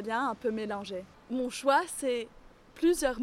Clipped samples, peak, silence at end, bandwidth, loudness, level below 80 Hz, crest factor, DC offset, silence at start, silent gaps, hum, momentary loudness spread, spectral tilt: under 0.1%; -12 dBFS; 0 s; 16 kHz; -31 LUFS; -56 dBFS; 18 dB; under 0.1%; 0 s; none; none; 12 LU; -3.5 dB/octave